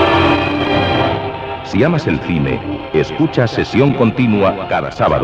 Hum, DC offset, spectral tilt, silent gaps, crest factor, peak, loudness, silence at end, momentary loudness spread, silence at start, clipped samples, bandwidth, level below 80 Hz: none; under 0.1%; -7.5 dB/octave; none; 14 dB; 0 dBFS; -15 LUFS; 0 s; 7 LU; 0 s; under 0.1%; 8.4 kHz; -36 dBFS